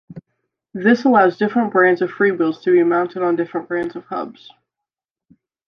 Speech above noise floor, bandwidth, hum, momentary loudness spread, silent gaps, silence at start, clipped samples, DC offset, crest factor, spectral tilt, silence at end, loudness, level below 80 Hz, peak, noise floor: 69 dB; 6.4 kHz; none; 13 LU; none; 0.1 s; under 0.1%; under 0.1%; 16 dB; -7.5 dB/octave; 1.35 s; -17 LUFS; -66 dBFS; -2 dBFS; -86 dBFS